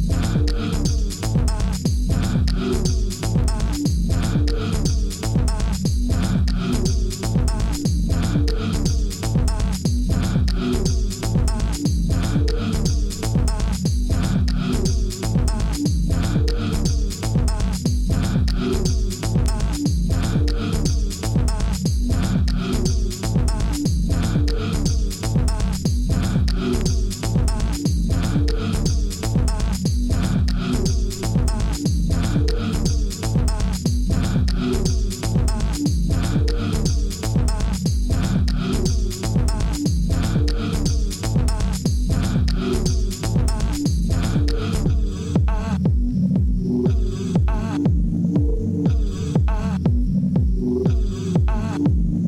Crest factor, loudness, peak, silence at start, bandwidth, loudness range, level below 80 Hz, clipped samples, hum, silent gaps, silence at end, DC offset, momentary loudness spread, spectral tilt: 14 dB; -22 LUFS; -6 dBFS; 0 s; 16 kHz; 1 LU; -22 dBFS; under 0.1%; none; none; 0 s; under 0.1%; 2 LU; -6 dB/octave